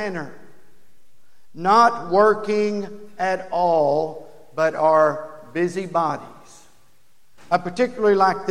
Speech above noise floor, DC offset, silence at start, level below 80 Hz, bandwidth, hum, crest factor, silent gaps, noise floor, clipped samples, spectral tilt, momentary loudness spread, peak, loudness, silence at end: 44 dB; 1%; 0 s; -64 dBFS; 12 kHz; none; 18 dB; none; -64 dBFS; under 0.1%; -5.5 dB/octave; 16 LU; -2 dBFS; -20 LUFS; 0 s